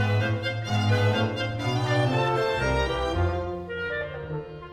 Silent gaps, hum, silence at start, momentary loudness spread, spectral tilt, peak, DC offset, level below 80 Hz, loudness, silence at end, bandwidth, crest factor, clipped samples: none; none; 0 s; 9 LU; -6.5 dB/octave; -12 dBFS; under 0.1%; -40 dBFS; -26 LUFS; 0 s; 11 kHz; 14 dB; under 0.1%